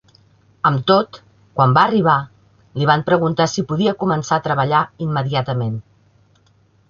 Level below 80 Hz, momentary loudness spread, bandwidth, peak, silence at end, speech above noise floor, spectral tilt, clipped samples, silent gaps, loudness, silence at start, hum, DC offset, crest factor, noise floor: -54 dBFS; 11 LU; 7.2 kHz; 0 dBFS; 1.1 s; 39 dB; -6 dB/octave; under 0.1%; none; -17 LUFS; 0.65 s; none; under 0.1%; 18 dB; -56 dBFS